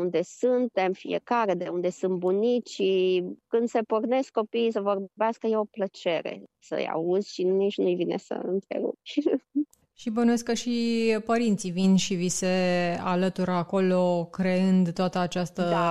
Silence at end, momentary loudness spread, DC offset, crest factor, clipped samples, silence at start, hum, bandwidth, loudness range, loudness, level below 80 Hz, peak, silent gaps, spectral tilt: 0 s; 7 LU; under 0.1%; 14 dB; under 0.1%; 0 s; none; 12 kHz; 3 LU; -26 LUFS; -66 dBFS; -12 dBFS; none; -5.5 dB/octave